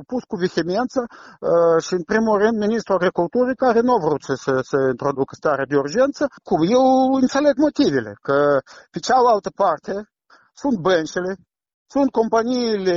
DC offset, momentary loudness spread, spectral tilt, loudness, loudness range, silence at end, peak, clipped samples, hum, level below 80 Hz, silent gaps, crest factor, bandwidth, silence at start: under 0.1%; 10 LU; -5.5 dB/octave; -19 LUFS; 3 LU; 0 s; -6 dBFS; under 0.1%; none; -56 dBFS; 11.74-11.86 s; 14 dB; 7.6 kHz; 0 s